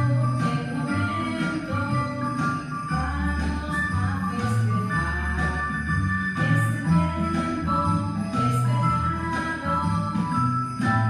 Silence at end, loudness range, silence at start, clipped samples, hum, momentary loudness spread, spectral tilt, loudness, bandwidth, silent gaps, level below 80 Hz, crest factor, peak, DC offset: 0 s; 3 LU; 0 s; under 0.1%; none; 4 LU; -7 dB/octave; -25 LUFS; 12.5 kHz; none; -38 dBFS; 14 dB; -10 dBFS; under 0.1%